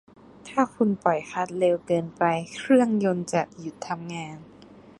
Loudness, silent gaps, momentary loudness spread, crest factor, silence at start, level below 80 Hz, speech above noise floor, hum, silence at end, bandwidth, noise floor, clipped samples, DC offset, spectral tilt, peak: -25 LUFS; none; 14 LU; 20 dB; 0.45 s; -66 dBFS; 24 dB; none; 0.1 s; 11.5 kHz; -49 dBFS; under 0.1%; under 0.1%; -6 dB/octave; -6 dBFS